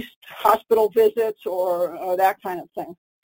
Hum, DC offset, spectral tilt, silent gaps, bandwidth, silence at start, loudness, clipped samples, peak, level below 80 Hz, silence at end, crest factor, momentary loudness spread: none; under 0.1%; -4.5 dB/octave; 0.16-0.21 s; 17 kHz; 0 s; -21 LUFS; under 0.1%; -4 dBFS; -62 dBFS; 0.3 s; 18 dB; 16 LU